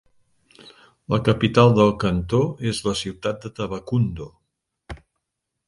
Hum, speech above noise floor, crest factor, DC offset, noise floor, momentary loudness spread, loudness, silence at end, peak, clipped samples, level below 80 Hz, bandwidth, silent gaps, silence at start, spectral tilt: none; 60 dB; 22 dB; under 0.1%; -80 dBFS; 25 LU; -21 LUFS; 0.7 s; -2 dBFS; under 0.1%; -44 dBFS; 11.5 kHz; none; 1.1 s; -6.5 dB/octave